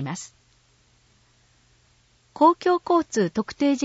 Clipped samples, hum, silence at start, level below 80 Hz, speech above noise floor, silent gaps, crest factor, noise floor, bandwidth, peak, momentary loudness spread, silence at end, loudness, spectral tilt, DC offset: under 0.1%; none; 0 s; -64 dBFS; 39 dB; none; 20 dB; -61 dBFS; 8 kHz; -6 dBFS; 15 LU; 0 s; -22 LUFS; -5.5 dB/octave; under 0.1%